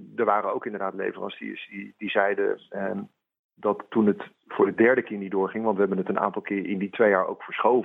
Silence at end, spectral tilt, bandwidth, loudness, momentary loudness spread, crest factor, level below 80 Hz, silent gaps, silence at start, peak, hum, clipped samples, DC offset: 0 s; -9 dB/octave; 3.9 kHz; -26 LUFS; 14 LU; 20 dB; -76 dBFS; 3.39-3.49 s; 0 s; -6 dBFS; none; under 0.1%; under 0.1%